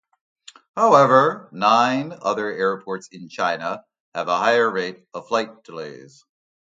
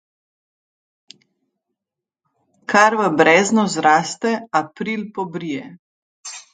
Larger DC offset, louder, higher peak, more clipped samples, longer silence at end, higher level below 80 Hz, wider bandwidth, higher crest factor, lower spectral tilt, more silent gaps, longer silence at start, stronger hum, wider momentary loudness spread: neither; second, -20 LUFS vs -17 LUFS; about the same, 0 dBFS vs 0 dBFS; neither; first, 0.8 s vs 0.15 s; second, -74 dBFS vs -68 dBFS; about the same, 9 kHz vs 9.6 kHz; about the same, 20 dB vs 20 dB; about the same, -5 dB/octave vs -4 dB/octave; second, 4.00-4.12 s vs 5.79-6.23 s; second, 0.75 s vs 2.7 s; neither; about the same, 20 LU vs 19 LU